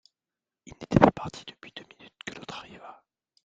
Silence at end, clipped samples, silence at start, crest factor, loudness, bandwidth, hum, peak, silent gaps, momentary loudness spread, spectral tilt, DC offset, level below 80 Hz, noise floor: 0.55 s; under 0.1%; 0.8 s; 30 dB; -25 LUFS; 9 kHz; none; 0 dBFS; none; 25 LU; -7 dB/octave; under 0.1%; -52 dBFS; under -90 dBFS